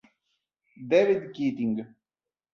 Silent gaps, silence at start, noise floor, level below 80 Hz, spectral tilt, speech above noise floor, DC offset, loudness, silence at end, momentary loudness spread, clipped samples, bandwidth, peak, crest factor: none; 0.8 s; under -90 dBFS; -72 dBFS; -7 dB/octave; over 65 dB; under 0.1%; -26 LUFS; 0.7 s; 20 LU; under 0.1%; 7 kHz; -8 dBFS; 20 dB